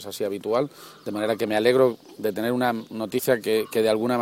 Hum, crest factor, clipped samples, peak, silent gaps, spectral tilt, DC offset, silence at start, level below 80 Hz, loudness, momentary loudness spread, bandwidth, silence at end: none; 18 dB; under 0.1%; -6 dBFS; none; -5 dB/octave; under 0.1%; 0 s; -66 dBFS; -24 LUFS; 10 LU; 17 kHz; 0 s